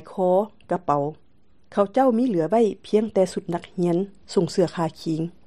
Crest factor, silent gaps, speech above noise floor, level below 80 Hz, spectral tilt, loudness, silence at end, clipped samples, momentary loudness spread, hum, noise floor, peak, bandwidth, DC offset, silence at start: 18 dB; none; 35 dB; -62 dBFS; -7 dB/octave; -23 LUFS; 0.15 s; under 0.1%; 8 LU; none; -58 dBFS; -6 dBFS; 12.5 kHz; 0.3%; 0 s